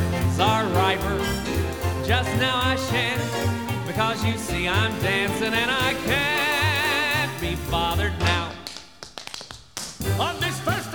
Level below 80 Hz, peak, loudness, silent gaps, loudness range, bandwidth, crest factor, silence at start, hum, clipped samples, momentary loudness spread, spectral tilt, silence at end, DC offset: -38 dBFS; -6 dBFS; -23 LUFS; none; 5 LU; over 20 kHz; 18 dB; 0 s; none; under 0.1%; 13 LU; -4.5 dB/octave; 0 s; 0.3%